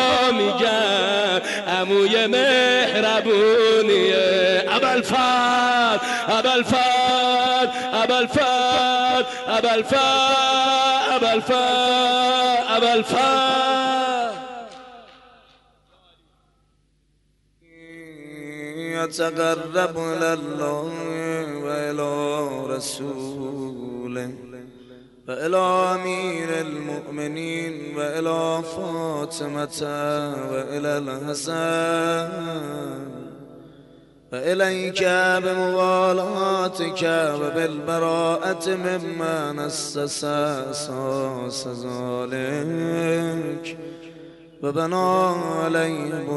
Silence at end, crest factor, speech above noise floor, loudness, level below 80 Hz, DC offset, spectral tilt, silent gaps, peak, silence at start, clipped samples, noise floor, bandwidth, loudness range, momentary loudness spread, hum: 0 s; 14 dB; 42 dB; -21 LUFS; -62 dBFS; under 0.1%; -3.5 dB/octave; none; -8 dBFS; 0 s; under 0.1%; -64 dBFS; 11.5 kHz; 10 LU; 13 LU; none